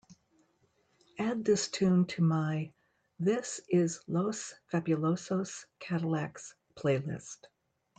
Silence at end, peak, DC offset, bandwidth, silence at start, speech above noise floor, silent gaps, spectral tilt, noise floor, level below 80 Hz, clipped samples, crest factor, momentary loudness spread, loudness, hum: 0.55 s; -16 dBFS; under 0.1%; 9 kHz; 0.1 s; 41 dB; none; -6 dB/octave; -72 dBFS; -72 dBFS; under 0.1%; 16 dB; 16 LU; -32 LUFS; none